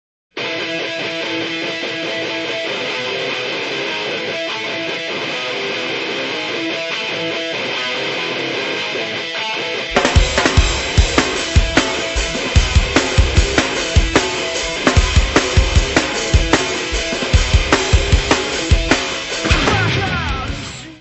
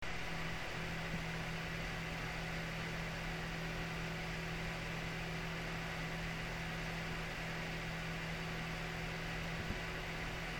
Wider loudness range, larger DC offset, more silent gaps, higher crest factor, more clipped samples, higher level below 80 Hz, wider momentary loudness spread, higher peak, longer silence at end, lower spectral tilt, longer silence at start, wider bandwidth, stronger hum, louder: first, 5 LU vs 0 LU; neither; neither; about the same, 18 dB vs 14 dB; neither; first, -22 dBFS vs -50 dBFS; first, 6 LU vs 0 LU; first, 0 dBFS vs -28 dBFS; about the same, 0 s vs 0 s; about the same, -4 dB/octave vs -4.5 dB/octave; first, 0.35 s vs 0 s; second, 8.4 kHz vs 17.5 kHz; neither; first, -17 LUFS vs -42 LUFS